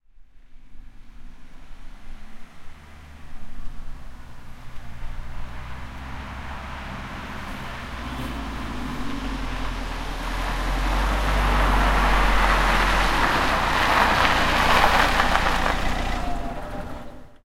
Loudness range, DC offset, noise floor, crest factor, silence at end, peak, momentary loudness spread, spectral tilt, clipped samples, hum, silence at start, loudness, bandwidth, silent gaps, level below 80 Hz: 21 LU; under 0.1%; -45 dBFS; 22 dB; 0.1 s; -2 dBFS; 23 LU; -4 dB/octave; under 0.1%; none; 0.2 s; -23 LUFS; 16 kHz; none; -28 dBFS